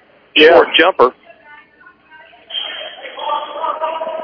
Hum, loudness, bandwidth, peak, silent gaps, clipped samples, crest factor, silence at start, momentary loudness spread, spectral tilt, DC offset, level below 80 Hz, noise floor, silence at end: none; -13 LUFS; 5.4 kHz; 0 dBFS; none; 0.4%; 16 dB; 0.35 s; 18 LU; -4.5 dB/octave; under 0.1%; -56 dBFS; -46 dBFS; 0 s